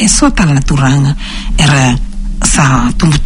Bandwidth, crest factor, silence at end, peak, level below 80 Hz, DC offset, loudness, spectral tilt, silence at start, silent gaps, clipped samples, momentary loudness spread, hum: 11 kHz; 10 dB; 0 s; 0 dBFS; -16 dBFS; under 0.1%; -10 LUFS; -4.5 dB/octave; 0 s; none; 0.4%; 10 LU; none